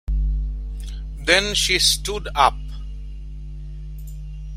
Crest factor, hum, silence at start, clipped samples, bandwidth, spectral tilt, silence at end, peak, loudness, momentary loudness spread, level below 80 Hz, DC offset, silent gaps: 22 dB; none; 0.05 s; under 0.1%; 16 kHz; -2 dB/octave; 0 s; -2 dBFS; -19 LUFS; 20 LU; -28 dBFS; under 0.1%; none